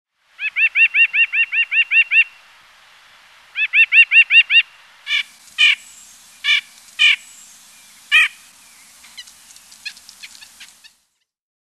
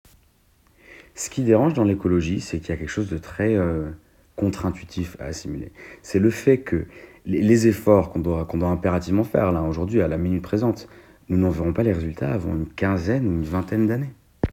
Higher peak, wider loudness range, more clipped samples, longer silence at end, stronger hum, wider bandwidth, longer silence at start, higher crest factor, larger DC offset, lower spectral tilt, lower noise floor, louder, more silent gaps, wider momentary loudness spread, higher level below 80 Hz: about the same, 0 dBFS vs -2 dBFS; first, 9 LU vs 5 LU; neither; first, 1.05 s vs 0 s; neither; second, 13 kHz vs 16.5 kHz; second, 0.4 s vs 0.9 s; about the same, 18 dB vs 20 dB; neither; second, 4.5 dB/octave vs -7.5 dB/octave; first, -68 dBFS vs -59 dBFS; first, -13 LUFS vs -23 LUFS; neither; first, 20 LU vs 13 LU; second, -74 dBFS vs -40 dBFS